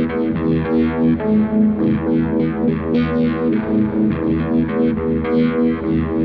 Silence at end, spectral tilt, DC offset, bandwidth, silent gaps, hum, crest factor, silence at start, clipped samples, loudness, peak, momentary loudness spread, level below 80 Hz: 0 s; -11 dB/octave; under 0.1%; 4.9 kHz; none; none; 12 dB; 0 s; under 0.1%; -17 LUFS; -6 dBFS; 3 LU; -36 dBFS